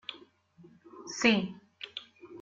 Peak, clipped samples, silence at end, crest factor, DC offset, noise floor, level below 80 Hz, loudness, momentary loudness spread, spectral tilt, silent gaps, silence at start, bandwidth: -12 dBFS; under 0.1%; 0 s; 22 dB; under 0.1%; -59 dBFS; -70 dBFS; -30 LUFS; 21 LU; -4 dB/octave; none; 0.1 s; 7.6 kHz